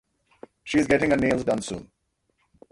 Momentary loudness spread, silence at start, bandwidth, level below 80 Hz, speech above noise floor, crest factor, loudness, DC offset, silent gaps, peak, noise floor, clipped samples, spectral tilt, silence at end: 16 LU; 0.65 s; 11.5 kHz; -52 dBFS; 49 dB; 20 dB; -23 LUFS; under 0.1%; none; -6 dBFS; -72 dBFS; under 0.1%; -5.5 dB/octave; 0.85 s